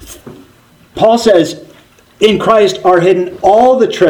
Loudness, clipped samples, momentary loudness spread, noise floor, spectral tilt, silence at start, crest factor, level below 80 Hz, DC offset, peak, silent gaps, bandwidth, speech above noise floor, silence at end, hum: -10 LUFS; 0.5%; 7 LU; -45 dBFS; -5 dB/octave; 0 s; 10 dB; -44 dBFS; under 0.1%; 0 dBFS; none; 19.5 kHz; 36 dB; 0 s; none